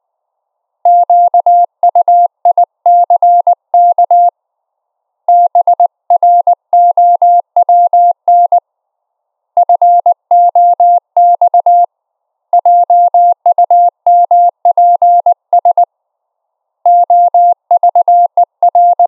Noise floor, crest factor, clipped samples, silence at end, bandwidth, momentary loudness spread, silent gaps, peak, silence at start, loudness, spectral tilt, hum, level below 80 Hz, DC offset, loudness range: -72 dBFS; 8 dB; under 0.1%; 0 s; 1.2 kHz; 4 LU; none; -2 dBFS; 0.85 s; -8 LUFS; -4 dB/octave; none; -90 dBFS; under 0.1%; 2 LU